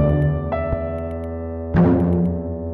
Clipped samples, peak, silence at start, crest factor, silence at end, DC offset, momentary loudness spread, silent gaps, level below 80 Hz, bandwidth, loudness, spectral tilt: under 0.1%; -6 dBFS; 0 s; 14 dB; 0 s; under 0.1%; 12 LU; none; -32 dBFS; 3.9 kHz; -21 LUFS; -11.5 dB/octave